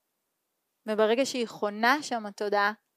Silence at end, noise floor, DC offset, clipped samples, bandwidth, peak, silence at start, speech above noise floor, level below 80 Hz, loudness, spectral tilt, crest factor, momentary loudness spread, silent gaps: 0.2 s; -80 dBFS; under 0.1%; under 0.1%; 15.5 kHz; -8 dBFS; 0.85 s; 53 dB; -86 dBFS; -27 LUFS; -3 dB/octave; 22 dB; 9 LU; none